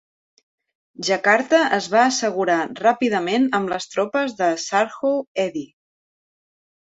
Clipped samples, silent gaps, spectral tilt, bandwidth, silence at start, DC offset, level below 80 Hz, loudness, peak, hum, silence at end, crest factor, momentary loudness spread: under 0.1%; 5.27-5.35 s; -3.5 dB/octave; 8.2 kHz; 1 s; under 0.1%; -68 dBFS; -20 LUFS; -2 dBFS; none; 1.2 s; 20 dB; 8 LU